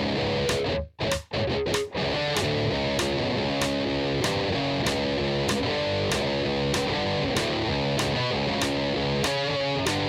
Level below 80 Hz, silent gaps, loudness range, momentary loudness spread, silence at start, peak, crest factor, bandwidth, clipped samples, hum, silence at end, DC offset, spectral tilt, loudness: -44 dBFS; none; 1 LU; 2 LU; 0 s; -10 dBFS; 16 dB; 16.5 kHz; under 0.1%; none; 0 s; under 0.1%; -4.5 dB/octave; -26 LUFS